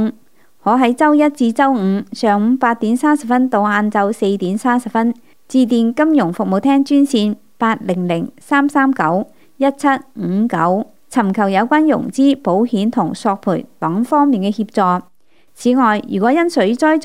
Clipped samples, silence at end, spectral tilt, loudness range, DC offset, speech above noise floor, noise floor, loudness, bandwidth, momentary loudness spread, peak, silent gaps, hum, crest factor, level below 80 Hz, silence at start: under 0.1%; 0 s; -6.5 dB/octave; 2 LU; 0.5%; 38 dB; -52 dBFS; -15 LUFS; 14 kHz; 7 LU; 0 dBFS; none; none; 14 dB; -66 dBFS; 0 s